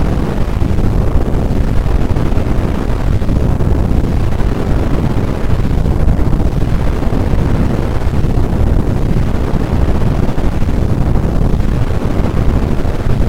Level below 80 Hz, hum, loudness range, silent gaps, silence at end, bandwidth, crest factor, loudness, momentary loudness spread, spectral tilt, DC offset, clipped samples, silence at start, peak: -14 dBFS; none; 0 LU; none; 0 s; 13.5 kHz; 10 dB; -15 LUFS; 2 LU; -8 dB/octave; 10%; 0.2%; 0 s; 0 dBFS